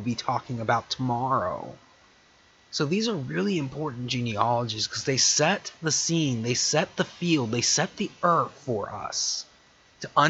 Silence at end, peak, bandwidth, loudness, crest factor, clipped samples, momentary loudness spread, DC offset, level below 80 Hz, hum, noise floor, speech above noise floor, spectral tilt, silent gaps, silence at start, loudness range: 0 s; -6 dBFS; 8.4 kHz; -26 LUFS; 22 dB; under 0.1%; 9 LU; under 0.1%; -62 dBFS; none; -58 dBFS; 32 dB; -3.5 dB/octave; none; 0 s; 5 LU